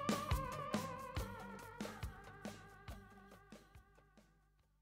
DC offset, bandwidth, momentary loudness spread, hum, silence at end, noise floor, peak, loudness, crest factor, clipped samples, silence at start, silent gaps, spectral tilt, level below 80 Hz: under 0.1%; 16 kHz; 20 LU; none; 0.6 s; -74 dBFS; -22 dBFS; -46 LUFS; 24 dB; under 0.1%; 0 s; none; -5 dB/octave; -54 dBFS